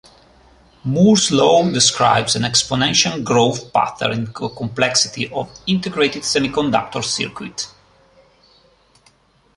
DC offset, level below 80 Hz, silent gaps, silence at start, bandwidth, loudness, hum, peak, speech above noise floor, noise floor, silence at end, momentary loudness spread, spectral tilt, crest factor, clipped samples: under 0.1%; -50 dBFS; none; 0.85 s; 11.5 kHz; -17 LUFS; none; 0 dBFS; 38 dB; -55 dBFS; 1.9 s; 12 LU; -3.5 dB/octave; 18 dB; under 0.1%